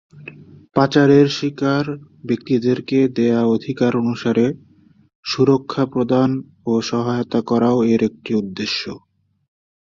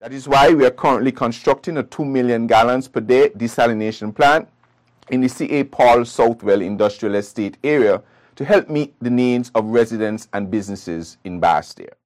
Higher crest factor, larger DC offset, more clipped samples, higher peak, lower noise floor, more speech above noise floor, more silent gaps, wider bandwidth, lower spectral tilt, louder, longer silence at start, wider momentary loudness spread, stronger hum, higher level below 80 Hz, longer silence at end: first, 18 dB vs 12 dB; neither; neither; first, -2 dBFS vs -6 dBFS; second, -40 dBFS vs -57 dBFS; second, 22 dB vs 40 dB; first, 5.15-5.23 s vs none; second, 7.4 kHz vs 15 kHz; about the same, -6.5 dB/octave vs -6 dB/octave; about the same, -18 LUFS vs -17 LUFS; first, 0.15 s vs 0 s; about the same, 12 LU vs 11 LU; neither; second, -56 dBFS vs -50 dBFS; first, 0.8 s vs 0.2 s